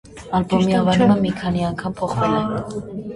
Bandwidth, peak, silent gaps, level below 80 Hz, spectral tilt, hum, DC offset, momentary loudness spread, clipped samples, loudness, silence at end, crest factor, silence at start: 11 kHz; -4 dBFS; none; -44 dBFS; -7 dB/octave; none; under 0.1%; 10 LU; under 0.1%; -19 LUFS; 0 s; 16 dB; 0.05 s